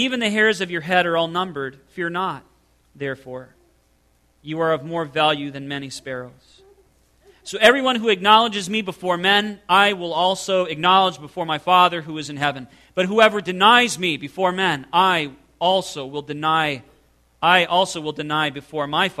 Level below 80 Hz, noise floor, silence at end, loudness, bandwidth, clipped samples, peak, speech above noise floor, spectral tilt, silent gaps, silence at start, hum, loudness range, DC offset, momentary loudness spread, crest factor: -60 dBFS; -61 dBFS; 0.05 s; -19 LUFS; 14 kHz; under 0.1%; 0 dBFS; 41 dB; -3.5 dB/octave; none; 0 s; none; 8 LU; under 0.1%; 15 LU; 20 dB